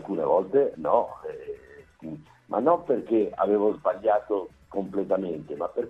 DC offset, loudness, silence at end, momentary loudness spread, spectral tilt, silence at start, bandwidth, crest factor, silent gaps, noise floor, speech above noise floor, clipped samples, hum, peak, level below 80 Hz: under 0.1%; -26 LUFS; 0 s; 17 LU; -9 dB/octave; 0 s; 5.4 kHz; 20 dB; none; -49 dBFS; 24 dB; under 0.1%; none; -6 dBFS; -62 dBFS